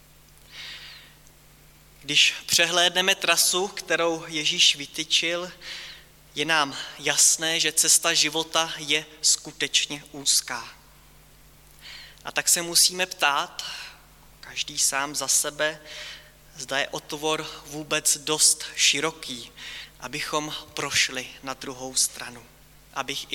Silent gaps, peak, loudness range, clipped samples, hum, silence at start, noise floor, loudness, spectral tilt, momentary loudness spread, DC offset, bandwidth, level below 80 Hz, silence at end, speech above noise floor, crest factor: none; -6 dBFS; 6 LU; under 0.1%; none; 0.5 s; -53 dBFS; -22 LUFS; 0 dB/octave; 19 LU; under 0.1%; 17.5 kHz; -60 dBFS; 0 s; 28 dB; 20 dB